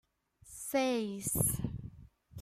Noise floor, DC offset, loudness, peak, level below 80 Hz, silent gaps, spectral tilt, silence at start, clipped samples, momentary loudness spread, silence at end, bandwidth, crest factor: -61 dBFS; under 0.1%; -34 LUFS; -14 dBFS; -54 dBFS; none; -4.5 dB/octave; 0.45 s; under 0.1%; 21 LU; 0 s; 16 kHz; 22 dB